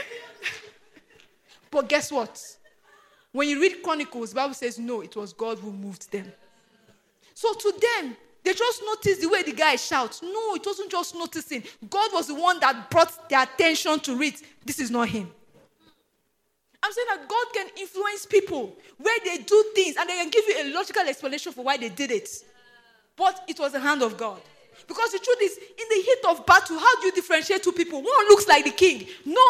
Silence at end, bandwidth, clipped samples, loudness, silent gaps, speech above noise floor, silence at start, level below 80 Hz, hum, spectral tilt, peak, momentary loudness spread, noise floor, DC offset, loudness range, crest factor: 0 s; 15.5 kHz; under 0.1%; -24 LUFS; none; 50 dB; 0 s; -64 dBFS; none; -2.5 dB/octave; -4 dBFS; 15 LU; -73 dBFS; under 0.1%; 9 LU; 22 dB